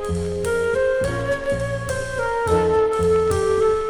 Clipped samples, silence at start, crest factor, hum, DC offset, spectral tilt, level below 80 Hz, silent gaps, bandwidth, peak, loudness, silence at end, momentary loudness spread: under 0.1%; 0 s; 12 dB; none; under 0.1%; -5.5 dB/octave; -36 dBFS; none; 19.5 kHz; -8 dBFS; -21 LUFS; 0 s; 6 LU